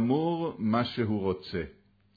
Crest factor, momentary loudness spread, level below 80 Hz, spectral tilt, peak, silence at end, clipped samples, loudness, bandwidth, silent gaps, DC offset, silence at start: 14 dB; 9 LU; -58 dBFS; -9 dB/octave; -14 dBFS; 0.45 s; under 0.1%; -30 LUFS; 5 kHz; none; under 0.1%; 0 s